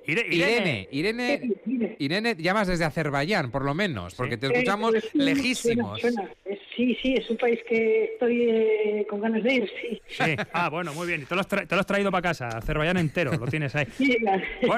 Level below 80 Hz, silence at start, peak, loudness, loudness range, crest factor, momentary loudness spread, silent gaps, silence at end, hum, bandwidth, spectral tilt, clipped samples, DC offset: -48 dBFS; 0.05 s; -14 dBFS; -25 LUFS; 2 LU; 12 dB; 6 LU; none; 0 s; none; 15 kHz; -5.5 dB/octave; under 0.1%; under 0.1%